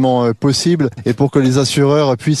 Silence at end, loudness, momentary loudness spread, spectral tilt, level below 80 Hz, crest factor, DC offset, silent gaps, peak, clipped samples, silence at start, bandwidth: 0 s; -14 LUFS; 4 LU; -6 dB/octave; -48 dBFS; 12 dB; under 0.1%; none; -2 dBFS; under 0.1%; 0 s; 13 kHz